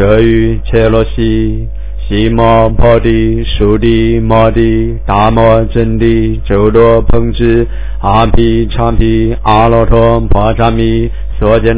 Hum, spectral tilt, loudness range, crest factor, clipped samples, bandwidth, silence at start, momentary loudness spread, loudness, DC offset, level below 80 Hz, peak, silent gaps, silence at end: none; -11.5 dB/octave; 1 LU; 8 dB; 3%; 4 kHz; 0 s; 6 LU; -9 LUFS; 10%; -16 dBFS; 0 dBFS; none; 0 s